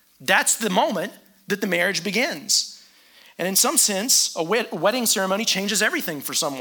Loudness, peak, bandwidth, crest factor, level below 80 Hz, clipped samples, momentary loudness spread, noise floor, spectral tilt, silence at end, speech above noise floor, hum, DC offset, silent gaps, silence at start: -20 LUFS; -4 dBFS; 19.5 kHz; 20 dB; -74 dBFS; under 0.1%; 9 LU; -52 dBFS; -1.5 dB/octave; 0 s; 30 dB; none; under 0.1%; none; 0.2 s